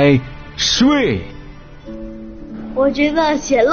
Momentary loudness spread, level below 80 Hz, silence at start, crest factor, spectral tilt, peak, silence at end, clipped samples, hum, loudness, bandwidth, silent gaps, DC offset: 20 LU; -36 dBFS; 0 s; 14 dB; -4 dB/octave; -2 dBFS; 0 s; under 0.1%; none; -16 LUFS; 6.8 kHz; none; under 0.1%